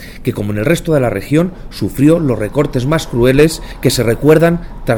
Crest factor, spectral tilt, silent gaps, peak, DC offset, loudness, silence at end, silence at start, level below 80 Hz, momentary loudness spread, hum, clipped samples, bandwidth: 12 dB; -6 dB/octave; none; 0 dBFS; under 0.1%; -13 LUFS; 0 s; 0 s; -30 dBFS; 10 LU; none; under 0.1%; 19 kHz